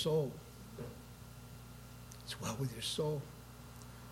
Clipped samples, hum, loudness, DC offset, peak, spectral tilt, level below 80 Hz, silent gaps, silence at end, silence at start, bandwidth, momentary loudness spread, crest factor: under 0.1%; 60 Hz at -55 dBFS; -42 LUFS; under 0.1%; -24 dBFS; -5 dB/octave; -60 dBFS; none; 0 s; 0 s; 16.5 kHz; 16 LU; 18 dB